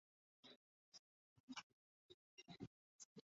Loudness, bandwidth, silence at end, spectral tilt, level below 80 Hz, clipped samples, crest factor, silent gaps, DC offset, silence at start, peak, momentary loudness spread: -62 LUFS; 7.4 kHz; 0.05 s; -3 dB/octave; -90 dBFS; under 0.1%; 24 dB; 0.56-0.92 s, 0.99-1.48 s, 1.63-2.37 s, 2.67-2.99 s, 3.05-3.16 s; under 0.1%; 0.45 s; -40 dBFS; 10 LU